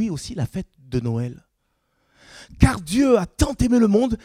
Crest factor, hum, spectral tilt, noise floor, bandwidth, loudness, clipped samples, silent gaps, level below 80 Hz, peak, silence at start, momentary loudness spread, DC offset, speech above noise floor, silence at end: 22 dB; none; -6.5 dB/octave; -71 dBFS; 15.5 kHz; -21 LUFS; under 0.1%; none; -34 dBFS; 0 dBFS; 0 s; 11 LU; under 0.1%; 51 dB; 0.1 s